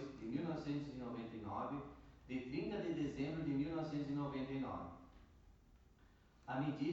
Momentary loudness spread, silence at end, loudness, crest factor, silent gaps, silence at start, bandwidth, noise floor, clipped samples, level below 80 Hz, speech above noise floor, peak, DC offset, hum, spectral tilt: 11 LU; 0 s; -44 LUFS; 16 dB; none; 0 s; 7.6 kHz; -68 dBFS; under 0.1%; -66 dBFS; 26 dB; -28 dBFS; under 0.1%; none; -8 dB/octave